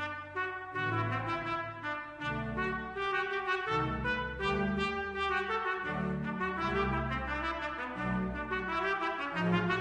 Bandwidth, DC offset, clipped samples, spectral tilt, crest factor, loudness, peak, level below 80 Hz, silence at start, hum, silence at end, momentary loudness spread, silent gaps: 10 kHz; under 0.1%; under 0.1%; -6.5 dB/octave; 18 dB; -34 LUFS; -16 dBFS; -50 dBFS; 0 s; none; 0 s; 5 LU; none